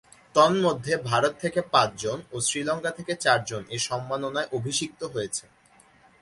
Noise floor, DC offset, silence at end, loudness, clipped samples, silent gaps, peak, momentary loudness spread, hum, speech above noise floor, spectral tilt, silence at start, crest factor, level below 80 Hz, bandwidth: -58 dBFS; under 0.1%; 0.8 s; -26 LUFS; under 0.1%; none; -4 dBFS; 11 LU; none; 32 dB; -3.5 dB/octave; 0.35 s; 22 dB; -62 dBFS; 11.5 kHz